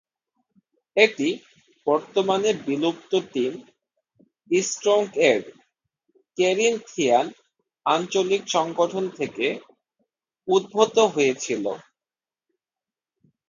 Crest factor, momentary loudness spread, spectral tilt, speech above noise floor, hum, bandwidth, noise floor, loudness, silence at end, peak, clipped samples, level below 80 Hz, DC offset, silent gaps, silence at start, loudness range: 22 dB; 10 LU; -3.5 dB/octave; over 68 dB; none; 9.6 kHz; under -90 dBFS; -23 LUFS; 1.7 s; -4 dBFS; under 0.1%; -74 dBFS; under 0.1%; none; 0.95 s; 2 LU